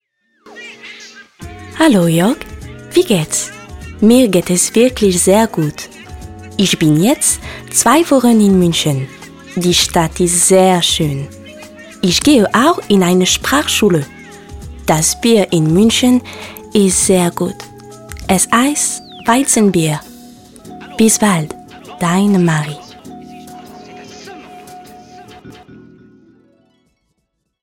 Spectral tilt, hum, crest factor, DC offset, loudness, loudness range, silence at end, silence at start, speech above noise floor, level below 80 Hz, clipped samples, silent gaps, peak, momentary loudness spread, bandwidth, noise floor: -4 dB/octave; none; 14 dB; under 0.1%; -12 LUFS; 4 LU; 2.1 s; 0.55 s; 57 dB; -40 dBFS; under 0.1%; none; 0 dBFS; 23 LU; 17 kHz; -69 dBFS